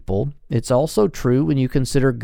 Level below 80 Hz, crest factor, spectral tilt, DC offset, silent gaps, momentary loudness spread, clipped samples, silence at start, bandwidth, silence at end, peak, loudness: -34 dBFS; 14 dB; -7 dB/octave; under 0.1%; none; 6 LU; under 0.1%; 0.1 s; 16.5 kHz; 0 s; -4 dBFS; -20 LUFS